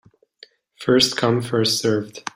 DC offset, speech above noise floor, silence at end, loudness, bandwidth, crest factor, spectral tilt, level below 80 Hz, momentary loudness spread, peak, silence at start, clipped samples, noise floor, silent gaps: under 0.1%; 31 dB; 0.05 s; -19 LUFS; 16 kHz; 18 dB; -4 dB/octave; -60 dBFS; 8 LU; -4 dBFS; 0.8 s; under 0.1%; -51 dBFS; none